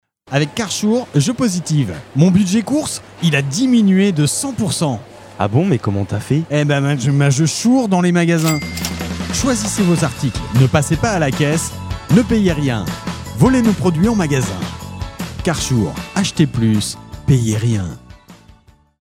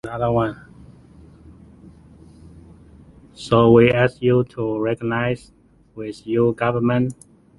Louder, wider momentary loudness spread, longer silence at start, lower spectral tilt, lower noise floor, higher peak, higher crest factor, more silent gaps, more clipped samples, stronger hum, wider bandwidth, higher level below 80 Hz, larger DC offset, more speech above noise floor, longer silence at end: first, -16 LUFS vs -19 LUFS; second, 9 LU vs 18 LU; first, 0.3 s vs 0.05 s; second, -5.5 dB/octave vs -8 dB/octave; about the same, -47 dBFS vs -47 dBFS; about the same, 0 dBFS vs -2 dBFS; about the same, 16 dB vs 20 dB; neither; neither; neither; first, 16.5 kHz vs 11.5 kHz; first, -38 dBFS vs -48 dBFS; neither; first, 32 dB vs 28 dB; first, 0.7 s vs 0.45 s